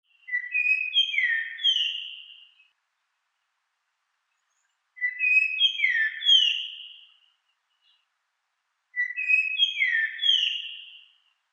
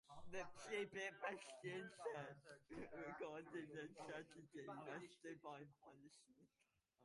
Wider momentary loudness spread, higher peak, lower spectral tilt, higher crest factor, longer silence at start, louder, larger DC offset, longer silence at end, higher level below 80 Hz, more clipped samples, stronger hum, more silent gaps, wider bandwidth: first, 16 LU vs 11 LU; first, -8 dBFS vs -36 dBFS; second, 10.5 dB/octave vs -4.5 dB/octave; about the same, 20 dB vs 18 dB; first, 0.3 s vs 0.05 s; first, -22 LUFS vs -53 LUFS; neither; first, 0.55 s vs 0 s; second, under -90 dBFS vs -82 dBFS; neither; neither; neither; second, 8.2 kHz vs 11.5 kHz